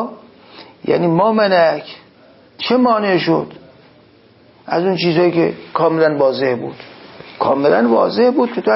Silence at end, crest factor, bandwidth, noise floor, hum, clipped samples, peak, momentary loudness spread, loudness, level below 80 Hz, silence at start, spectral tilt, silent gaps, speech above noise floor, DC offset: 0 s; 14 dB; 5.8 kHz; -48 dBFS; none; under 0.1%; -2 dBFS; 15 LU; -15 LUFS; -60 dBFS; 0 s; -10 dB/octave; none; 33 dB; under 0.1%